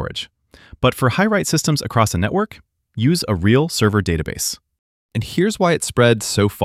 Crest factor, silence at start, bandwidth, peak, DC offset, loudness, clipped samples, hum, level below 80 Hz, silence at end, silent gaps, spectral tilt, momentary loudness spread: 18 dB; 0 s; 16 kHz; -2 dBFS; under 0.1%; -18 LUFS; under 0.1%; none; -40 dBFS; 0 s; 4.79-5.09 s; -5 dB/octave; 11 LU